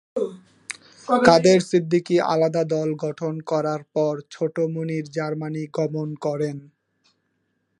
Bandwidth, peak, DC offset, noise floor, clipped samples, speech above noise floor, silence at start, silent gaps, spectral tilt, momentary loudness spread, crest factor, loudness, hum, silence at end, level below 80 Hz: 11.5 kHz; 0 dBFS; under 0.1%; -72 dBFS; under 0.1%; 50 dB; 0.15 s; none; -6 dB/octave; 14 LU; 22 dB; -22 LUFS; none; 1.2 s; -64 dBFS